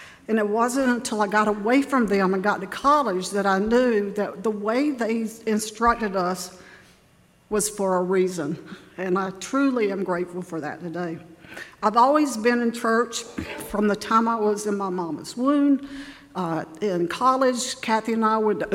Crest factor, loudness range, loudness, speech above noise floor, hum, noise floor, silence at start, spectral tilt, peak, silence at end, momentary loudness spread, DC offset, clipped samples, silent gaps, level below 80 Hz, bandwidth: 18 dB; 4 LU; -23 LUFS; 34 dB; none; -57 dBFS; 0 s; -4.5 dB/octave; -6 dBFS; 0 s; 11 LU; under 0.1%; under 0.1%; none; -54 dBFS; 16 kHz